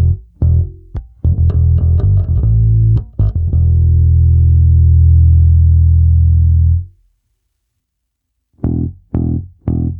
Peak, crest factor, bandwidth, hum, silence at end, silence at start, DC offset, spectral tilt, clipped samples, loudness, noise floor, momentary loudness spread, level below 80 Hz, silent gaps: -2 dBFS; 10 dB; 1.3 kHz; none; 0 s; 0 s; under 0.1%; -14 dB/octave; under 0.1%; -12 LUFS; -72 dBFS; 10 LU; -16 dBFS; none